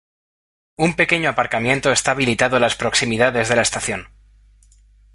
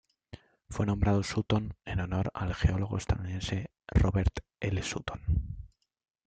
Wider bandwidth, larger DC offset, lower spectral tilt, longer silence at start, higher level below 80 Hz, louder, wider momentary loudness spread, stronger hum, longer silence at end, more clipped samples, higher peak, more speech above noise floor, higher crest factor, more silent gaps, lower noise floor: first, 11.5 kHz vs 9 kHz; neither; second, -3.5 dB/octave vs -6.5 dB/octave; first, 0.8 s vs 0.35 s; second, -46 dBFS vs -40 dBFS; first, -17 LUFS vs -32 LUFS; second, 5 LU vs 8 LU; first, 50 Hz at -45 dBFS vs none; first, 1.1 s vs 0.6 s; neither; first, -2 dBFS vs -12 dBFS; first, 33 dB vs 22 dB; about the same, 18 dB vs 20 dB; neither; about the same, -51 dBFS vs -52 dBFS